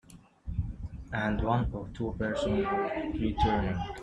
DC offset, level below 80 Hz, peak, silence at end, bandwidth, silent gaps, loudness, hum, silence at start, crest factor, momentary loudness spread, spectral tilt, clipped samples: under 0.1%; -40 dBFS; -12 dBFS; 0 s; 11 kHz; none; -31 LUFS; none; 0.1 s; 18 dB; 10 LU; -7.5 dB/octave; under 0.1%